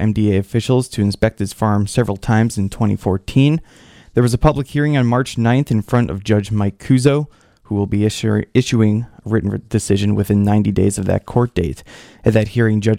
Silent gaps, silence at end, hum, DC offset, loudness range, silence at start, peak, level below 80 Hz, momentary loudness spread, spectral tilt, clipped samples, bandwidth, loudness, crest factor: none; 0 s; none; under 0.1%; 1 LU; 0 s; 0 dBFS; -36 dBFS; 6 LU; -7 dB/octave; under 0.1%; 14.5 kHz; -17 LUFS; 16 dB